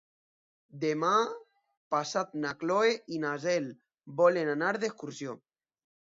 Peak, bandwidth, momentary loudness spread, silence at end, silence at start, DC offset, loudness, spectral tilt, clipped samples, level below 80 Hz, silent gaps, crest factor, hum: -12 dBFS; 7.8 kHz; 15 LU; 0.75 s; 0.75 s; under 0.1%; -30 LUFS; -4.5 dB/octave; under 0.1%; -80 dBFS; 1.77-1.91 s; 20 dB; none